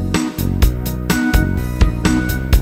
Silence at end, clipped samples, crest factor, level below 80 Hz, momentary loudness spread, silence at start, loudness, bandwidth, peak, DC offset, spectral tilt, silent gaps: 0 s; under 0.1%; 14 dB; -18 dBFS; 4 LU; 0 s; -17 LUFS; 16.5 kHz; 0 dBFS; under 0.1%; -5.5 dB/octave; none